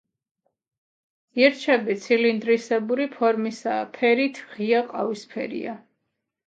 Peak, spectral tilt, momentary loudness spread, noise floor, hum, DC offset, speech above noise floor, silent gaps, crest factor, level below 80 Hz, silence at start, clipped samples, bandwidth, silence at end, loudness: -4 dBFS; -5 dB/octave; 11 LU; -79 dBFS; none; under 0.1%; 56 dB; none; 20 dB; -78 dBFS; 1.35 s; under 0.1%; 7.8 kHz; 0.7 s; -23 LUFS